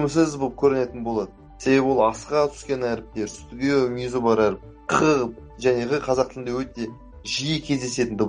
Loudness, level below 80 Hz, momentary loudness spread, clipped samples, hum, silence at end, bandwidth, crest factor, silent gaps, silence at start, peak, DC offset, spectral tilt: -23 LUFS; -48 dBFS; 11 LU; under 0.1%; none; 0 s; 10.5 kHz; 18 dB; none; 0 s; -6 dBFS; under 0.1%; -5 dB/octave